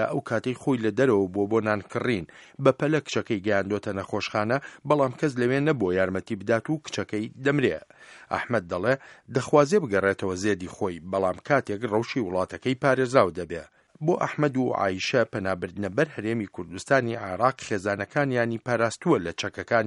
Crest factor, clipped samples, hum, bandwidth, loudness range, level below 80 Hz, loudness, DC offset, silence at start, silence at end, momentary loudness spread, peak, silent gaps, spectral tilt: 22 dB; under 0.1%; none; 11.5 kHz; 2 LU; -62 dBFS; -26 LUFS; under 0.1%; 0 s; 0 s; 8 LU; -4 dBFS; none; -6 dB/octave